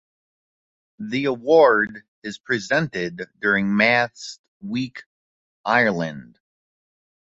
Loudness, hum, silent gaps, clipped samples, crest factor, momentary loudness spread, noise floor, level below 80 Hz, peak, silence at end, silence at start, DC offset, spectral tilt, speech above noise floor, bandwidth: -20 LUFS; none; 2.08-2.22 s, 4.39-4.60 s, 5.06-5.64 s; under 0.1%; 20 dB; 20 LU; under -90 dBFS; -62 dBFS; -2 dBFS; 1.15 s; 1 s; under 0.1%; -5.5 dB/octave; over 69 dB; 8 kHz